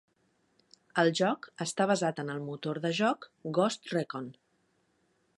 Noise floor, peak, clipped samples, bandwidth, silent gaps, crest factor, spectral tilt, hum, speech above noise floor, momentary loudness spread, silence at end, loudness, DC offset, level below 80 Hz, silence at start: -73 dBFS; -12 dBFS; under 0.1%; 11.5 kHz; none; 22 dB; -5 dB/octave; none; 42 dB; 10 LU; 1.05 s; -31 LUFS; under 0.1%; -80 dBFS; 0.95 s